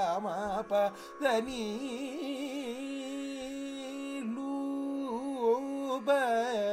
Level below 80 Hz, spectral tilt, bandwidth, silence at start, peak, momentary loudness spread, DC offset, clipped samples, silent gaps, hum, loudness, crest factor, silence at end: -66 dBFS; -4.5 dB/octave; 15.5 kHz; 0 s; -16 dBFS; 9 LU; under 0.1%; under 0.1%; none; none; -34 LUFS; 16 dB; 0 s